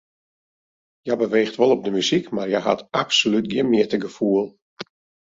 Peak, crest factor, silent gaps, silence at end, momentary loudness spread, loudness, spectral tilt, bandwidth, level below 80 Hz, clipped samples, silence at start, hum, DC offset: -4 dBFS; 18 dB; 4.62-4.77 s; 0.55 s; 17 LU; -20 LUFS; -4.5 dB/octave; 7.8 kHz; -64 dBFS; under 0.1%; 1.05 s; none; under 0.1%